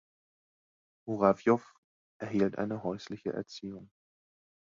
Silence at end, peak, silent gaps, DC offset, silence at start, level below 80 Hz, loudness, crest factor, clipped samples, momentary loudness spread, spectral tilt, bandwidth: 0.8 s; -10 dBFS; 1.78-2.20 s; under 0.1%; 1.05 s; -68 dBFS; -32 LUFS; 24 dB; under 0.1%; 17 LU; -7.5 dB/octave; 7.6 kHz